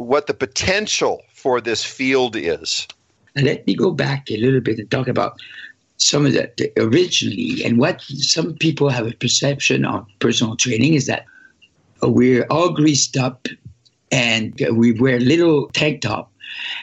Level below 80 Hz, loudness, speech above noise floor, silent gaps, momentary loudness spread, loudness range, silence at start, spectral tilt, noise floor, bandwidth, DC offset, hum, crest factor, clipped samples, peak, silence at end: -54 dBFS; -18 LUFS; 37 dB; none; 9 LU; 3 LU; 0 s; -4 dB/octave; -55 dBFS; 8.4 kHz; under 0.1%; none; 18 dB; under 0.1%; -2 dBFS; 0 s